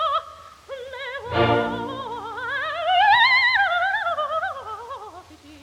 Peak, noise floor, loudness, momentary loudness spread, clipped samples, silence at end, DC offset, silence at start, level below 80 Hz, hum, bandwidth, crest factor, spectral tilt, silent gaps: -6 dBFS; -44 dBFS; -21 LUFS; 21 LU; under 0.1%; 0.05 s; under 0.1%; 0 s; -54 dBFS; none; 14.5 kHz; 16 dB; -4.5 dB/octave; none